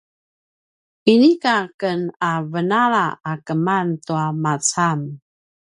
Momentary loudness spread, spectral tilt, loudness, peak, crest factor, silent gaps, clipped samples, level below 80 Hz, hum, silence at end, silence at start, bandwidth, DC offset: 10 LU; -5 dB/octave; -19 LUFS; 0 dBFS; 18 dB; 1.74-1.79 s; under 0.1%; -68 dBFS; none; 0.6 s; 1.05 s; 11.5 kHz; under 0.1%